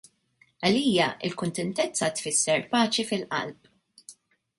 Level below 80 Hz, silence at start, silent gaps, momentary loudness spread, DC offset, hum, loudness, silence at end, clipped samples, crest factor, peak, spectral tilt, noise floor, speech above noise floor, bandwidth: -68 dBFS; 0.6 s; none; 8 LU; under 0.1%; none; -26 LUFS; 0.45 s; under 0.1%; 20 dB; -8 dBFS; -3 dB/octave; -65 dBFS; 39 dB; 11.5 kHz